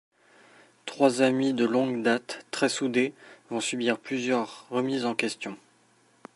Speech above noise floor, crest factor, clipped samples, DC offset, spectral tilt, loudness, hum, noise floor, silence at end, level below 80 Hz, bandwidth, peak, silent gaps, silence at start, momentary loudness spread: 36 dB; 22 dB; under 0.1%; under 0.1%; -4 dB/octave; -27 LUFS; none; -63 dBFS; 0.8 s; -78 dBFS; 11.5 kHz; -6 dBFS; none; 0.85 s; 12 LU